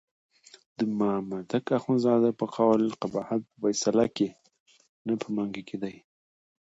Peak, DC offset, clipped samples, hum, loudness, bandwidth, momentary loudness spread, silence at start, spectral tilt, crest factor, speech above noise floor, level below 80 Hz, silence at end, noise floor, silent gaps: -10 dBFS; under 0.1%; under 0.1%; none; -28 LUFS; 8 kHz; 12 LU; 0.8 s; -5.5 dB/octave; 20 dB; over 63 dB; -70 dBFS; 0.75 s; under -90 dBFS; 4.60-4.66 s, 4.89-5.05 s